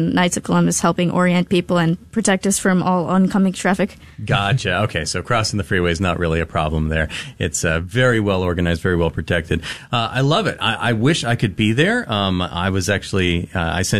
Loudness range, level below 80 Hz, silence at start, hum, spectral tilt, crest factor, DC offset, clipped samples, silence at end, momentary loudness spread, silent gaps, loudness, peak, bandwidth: 2 LU; -36 dBFS; 0 s; none; -5 dB/octave; 14 dB; under 0.1%; under 0.1%; 0 s; 5 LU; none; -18 LUFS; -4 dBFS; 13.5 kHz